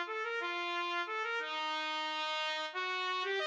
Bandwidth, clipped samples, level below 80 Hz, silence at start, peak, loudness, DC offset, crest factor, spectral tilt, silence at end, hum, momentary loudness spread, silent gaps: 9.2 kHz; under 0.1%; under -90 dBFS; 0 s; -24 dBFS; -36 LUFS; under 0.1%; 14 dB; 1.5 dB/octave; 0 s; none; 2 LU; none